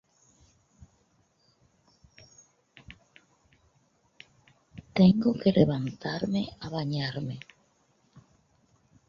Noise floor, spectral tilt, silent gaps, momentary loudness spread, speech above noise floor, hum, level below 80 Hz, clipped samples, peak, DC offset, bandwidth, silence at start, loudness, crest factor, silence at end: -68 dBFS; -8 dB/octave; none; 29 LU; 42 dB; none; -60 dBFS; under 0.1%; -8 dBFS; under 0.1%; 7 kHz; 2.9 s; -27 LUFS; 24 dB; 1.7 s